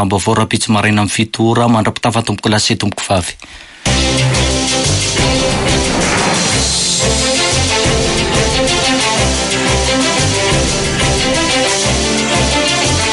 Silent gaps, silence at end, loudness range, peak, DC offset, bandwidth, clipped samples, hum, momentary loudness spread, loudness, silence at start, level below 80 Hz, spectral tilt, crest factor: none; 0 s; 2 LU; -2 dBFS; under 0.1%; 11.5 kHz; under 0.1%; none; 3 LU; -12 LUFS; 0 s; -26 dBFS; -3.5 dB/octave; 12 dB